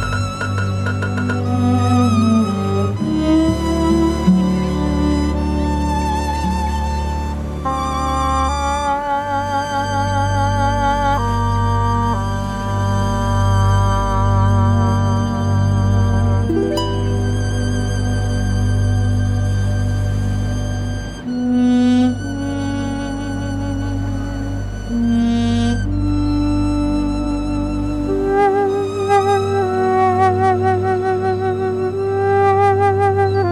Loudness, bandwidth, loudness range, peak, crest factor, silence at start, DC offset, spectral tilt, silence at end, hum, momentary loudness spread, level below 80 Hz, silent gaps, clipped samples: -18 LUFS; 12 kHz; 4 LU; -2 dBFS; 14 dB; 0 s; under 0.1%; -7 dB/octave; 0 s; none; 7 LU; -26 dBFS; none; under 0.1%